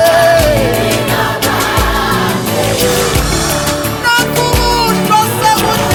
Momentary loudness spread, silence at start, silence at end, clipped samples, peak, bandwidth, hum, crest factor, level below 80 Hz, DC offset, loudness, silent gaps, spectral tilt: 4 LU; 0 s; 0 s; under 0.1%; 0 dBFS; over 20 kHz; none; 12 dB; -24 dBFS; under 0.1%; -11 LUFS; none; -4 dB/octave